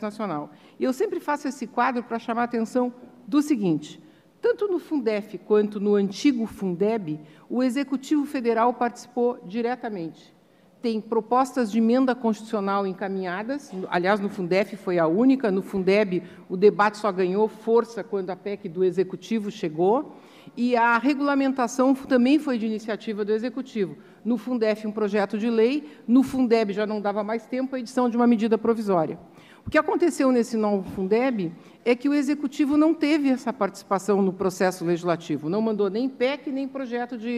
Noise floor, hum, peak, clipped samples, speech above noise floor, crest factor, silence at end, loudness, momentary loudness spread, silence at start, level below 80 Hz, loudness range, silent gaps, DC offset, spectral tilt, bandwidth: -56 dBFS; none; -6 dBFS; under 0.1%; 32 dB; 18 dB; 0 s; -24 LUFS; 10 LU; 0 s; -64 dBFS; 4 LU; none; under 0.1%; -6 dB/octave; 14 kHz